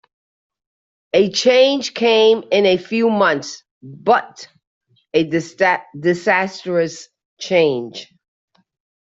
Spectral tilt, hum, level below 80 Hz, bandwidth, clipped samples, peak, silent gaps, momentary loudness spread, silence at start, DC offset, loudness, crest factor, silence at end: -4 dB/octave; none; -64 dBFS; 7.8 kHz; under 0.1%; -2 dBFS; 3.71-3.81 s, 4.67-4.81 s, 7.25-7.37 s; 16 LU; 1.15 s; under 0.1%; -17 LUFS; 16 dB; 1 s